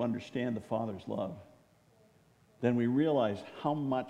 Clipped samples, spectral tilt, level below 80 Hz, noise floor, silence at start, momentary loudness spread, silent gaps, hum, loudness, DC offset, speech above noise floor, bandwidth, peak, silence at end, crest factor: under 0.1%; -8 dB/octave; -74 dBFS; -65 dBFS; 0 s; 9 LU; none; none; -33 LUFS; under 0.1%; 33 dB; 10 kHz; -16 dBFS; 0 s; 18 dB